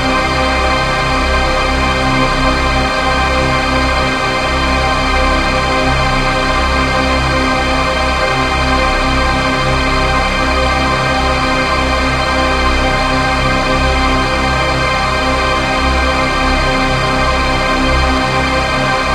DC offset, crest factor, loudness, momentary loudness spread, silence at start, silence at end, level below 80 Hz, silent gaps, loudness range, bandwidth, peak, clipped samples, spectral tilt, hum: under 0.1%; 12 dB; -13 LUFS; 1 LU; 0 s; 0 s; -20 dBFS; none; 0 LU; 13.5 kHz; 0 dBFS; under 0.1%; -4.5 dB/octave; none